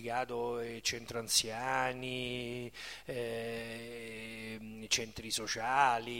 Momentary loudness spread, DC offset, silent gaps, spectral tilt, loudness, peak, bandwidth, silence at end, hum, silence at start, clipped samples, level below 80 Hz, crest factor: 14 LU; under 0.1%; none; -2 dB/octave; -36 LUFS; -14 dBFS; 16.5 kHz; 0 s; none; 0 s; under 0.1%; -64 dBFS; 22 dB